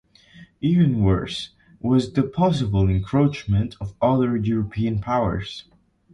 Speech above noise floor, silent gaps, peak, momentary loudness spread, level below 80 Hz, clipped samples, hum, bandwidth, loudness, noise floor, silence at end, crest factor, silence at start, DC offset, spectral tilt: 28 dB; none; -6 dBFS; 11 LU; -38 dBFS; under 0.1%; none; 10.5 kHz; -22 LUFS; -49 dBFS; 0.55 s; 16 dB; 0.35 s; under 0.1%; -8 dB/octave